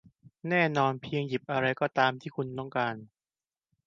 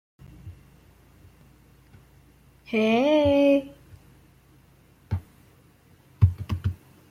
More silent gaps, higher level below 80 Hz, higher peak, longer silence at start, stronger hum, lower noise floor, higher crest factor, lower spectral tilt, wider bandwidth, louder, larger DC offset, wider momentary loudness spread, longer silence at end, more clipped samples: neither; second, -70 dBFS vs -48 dBFS; about the same, -8 dBFS vs -6 dBFS; second, 0.25 s vs 0.45 s; neither; first, under -90 dBFS vs -57 dBFS; about the same, 22 dB vs 22 dB; second, -6.5 dB/octave vs -8 dB/octave; second, 7.4 kHz vs 13.5 kHz; second, -29 LUFS vs -24 LUFS; neither; second, 10 LU vs 27 LU; first, 0.8 s vs 0.35 s; neither